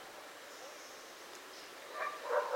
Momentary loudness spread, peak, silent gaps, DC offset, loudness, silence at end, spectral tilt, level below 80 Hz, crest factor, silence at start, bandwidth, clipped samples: 13 LU; -22 dBFS; none; under 0.1%; -44 LUFS; 0 s; -0.5 dB/octave; -86 dBFS; 22 dB; 0 s; 16 kHz; under 0.1%